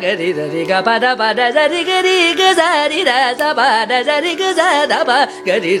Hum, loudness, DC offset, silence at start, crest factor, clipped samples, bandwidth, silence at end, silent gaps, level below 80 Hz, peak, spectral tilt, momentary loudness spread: none; -13 LUFS; under 0.1%; 0 s; 14 dB; under 0.1%; 16 kHz; 0 s; none; -64 dBFS; 0 dBFS; -2.5 dB/octave; 5 LU